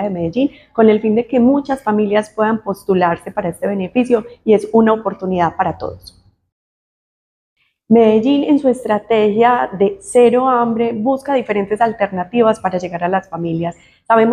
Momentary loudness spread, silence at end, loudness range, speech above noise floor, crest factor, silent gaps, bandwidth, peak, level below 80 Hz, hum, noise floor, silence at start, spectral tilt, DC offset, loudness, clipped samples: 9 LU; 0 s; 4 LU; over 75 dB; 14 dB; 6.52-7.56 s; 12.5 kHz; 0 dBFS; -52 dBFS; none; under -90 dBFS; 0 s; -7 dB/octave; under 0.1%; -15 LUFS; under 0.1%